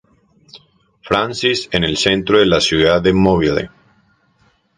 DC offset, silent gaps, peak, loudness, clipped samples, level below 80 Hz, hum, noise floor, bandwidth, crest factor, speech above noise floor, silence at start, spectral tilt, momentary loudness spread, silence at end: under 0.1%; none; 0 dBFS; -15 LUFS; under 0.1%; -38 dBFS; none; -58 dBFS; 11 kHz; 16 dB; 43 dB; 0.55 s; -4.5 dB/octave; 6 LU; 1.1 s